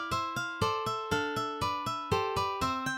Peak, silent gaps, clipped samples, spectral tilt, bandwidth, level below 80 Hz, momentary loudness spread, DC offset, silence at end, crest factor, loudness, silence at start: -16 dBFS; none; under 0.1%; -4.5 dB/octave; 16.5 kHz; -54 dBFS; 2 LU; under 0.1%; 0 s; 16 dB; -32 LUFS; 0 s